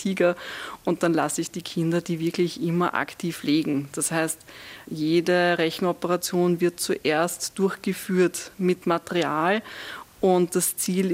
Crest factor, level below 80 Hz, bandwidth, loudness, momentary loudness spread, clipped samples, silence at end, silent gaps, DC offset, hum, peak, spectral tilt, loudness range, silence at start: 18 dB; -64 dBFS; 16 kHz; -24 LUFS; 8 LU; under 0.1%; 0 s; none; under 0.1%; none; -6 dBFS; -4.5 dB/octave; 2 LU; 0 s